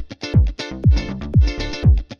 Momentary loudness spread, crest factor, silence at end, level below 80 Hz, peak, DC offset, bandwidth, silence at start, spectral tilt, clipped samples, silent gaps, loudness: 4 LU; 14 dB; 0.05 s; -20 dBFS; -4 dBFS; under 0.1%; 7 kHz; 0 s; -7 dB/octave; under 0.1%; none; -19 LUFS